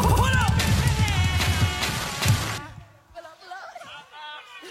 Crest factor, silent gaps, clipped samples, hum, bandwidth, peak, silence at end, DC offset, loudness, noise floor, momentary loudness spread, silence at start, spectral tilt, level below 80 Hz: 18 dB; none; under 0.1%; none; 16.5 kHz; -6 dBFS; 0 s; under 0.1%; -23 LUFS; -45 dBFS; 20 LU; 0 s; -4 dB/octave; -32 dBFS